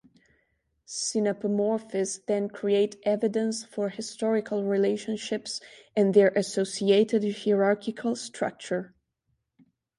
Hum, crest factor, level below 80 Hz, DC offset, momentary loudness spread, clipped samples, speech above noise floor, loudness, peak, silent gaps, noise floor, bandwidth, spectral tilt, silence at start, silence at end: none; 20 dB; -74 dBFS; under 0.1%; 10 LU; under 0.1%; 51 dB; -27 LUFS; -8 dBFS; none; -77 dBFS; 11.5 kHz; -4.5 dB/octave; 0.9 s; 1.1 s